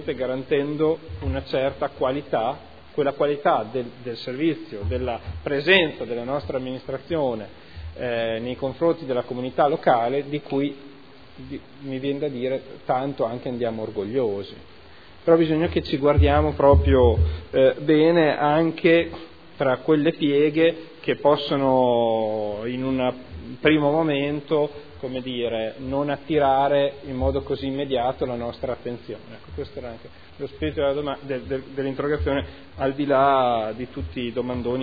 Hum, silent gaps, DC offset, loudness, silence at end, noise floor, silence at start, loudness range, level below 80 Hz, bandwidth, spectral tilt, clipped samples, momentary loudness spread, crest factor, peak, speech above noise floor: none; none; 0.4%; -23 LUFS; 0 s; -48 dBFS; 0 s; 9 LU; -38 dBFS; 5 kHz; -9 dB/octave; under 0.1%; 14 LU; 22 dB; -2 dBFS; 25 dB